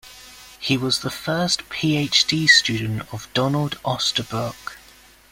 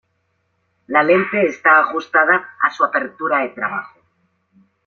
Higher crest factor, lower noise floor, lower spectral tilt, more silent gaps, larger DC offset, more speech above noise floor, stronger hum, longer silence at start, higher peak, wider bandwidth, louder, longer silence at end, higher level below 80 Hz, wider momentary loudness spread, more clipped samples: about the same, 22 dB vs 18 dB; second, -49 dBFS vs -67 dBFS; second, -3.5 dB/octave vs -6 dB/octave; neither; neither; second, 28 dB vs 51 dB; neither; second, 0.05 s vs 0.9 s; about the same, -2 dBFS vs -2 dBFS; first, 16.5 kHz vs 7 kHz; second, -20 LUFS vs -16 LUFS; second, 0.55 s vs 1 s; first, -54 dBFS vs -68 dBFS; first, 16 LU vs 9 LU; neither